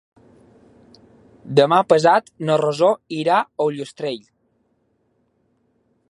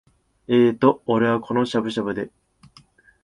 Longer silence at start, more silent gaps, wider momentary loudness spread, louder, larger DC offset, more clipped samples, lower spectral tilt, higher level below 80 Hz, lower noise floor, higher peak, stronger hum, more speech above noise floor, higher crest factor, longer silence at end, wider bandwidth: first, 1.45 s vs 0.5 s; neither; about the same, 13 LU vs 11 LU; first, -18 LUFS vs -21 LUFS; neither; neither; second, -5.5 dB/octave vs -7 dB/octave; second, -68 dBFS vs -60 dBFS; first, -66 dBFS vs -54 dBFS; about the same, 0 dBFS vs -2 dBFS; neither; first, 48 dB vs 34 dB; about the same, 20 dB vs 20 dB; first, 1.95 s vs 0.95 s; about the same, 11.5 kHz vs 11 kHz